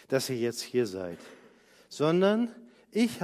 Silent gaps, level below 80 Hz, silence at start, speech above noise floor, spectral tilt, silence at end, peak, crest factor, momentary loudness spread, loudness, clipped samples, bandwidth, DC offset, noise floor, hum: none; -70 dBFS; 0.1 s; 30 dB; -5.5 dB/octave; 0 s; -12 dBFS; 18 dB; 15 LU; -29 LUFS; under 0.1%; 15.5 kHz; under 0.1%; -58 dBFS; none